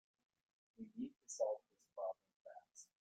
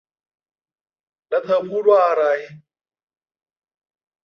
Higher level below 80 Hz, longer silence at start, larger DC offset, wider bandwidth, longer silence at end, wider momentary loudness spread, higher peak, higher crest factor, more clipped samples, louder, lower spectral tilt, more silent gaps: second, under -90 dBFS vs -76 dBFS; second, 0.8 s vs 1.3 s; neither; first, 9.6 kHz vs 6.6 kHz; second, 0.15 s vs 1.65 s; first, 18 LU vs 10 LU; second, -28 dBFS vs -4 dBFS; about the same, 22 dB vs 20 dB; neither; second, -47 LUFS vs -18 LUFS; second, -4 dB/octave vs -6 dB/octave; first, 2.36-2.45 s vs none